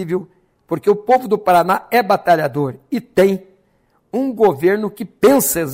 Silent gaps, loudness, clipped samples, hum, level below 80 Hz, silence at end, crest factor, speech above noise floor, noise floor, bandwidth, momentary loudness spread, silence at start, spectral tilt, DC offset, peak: none; -16 LUFS; under 0.1%; none; -54 dBFS; 0 s; 14 dB; 44 dB; -60 dBFS; 16.5 kHz; 11 LU; 0 s; -5 dB/octave; under 0.1%; -2 dBFS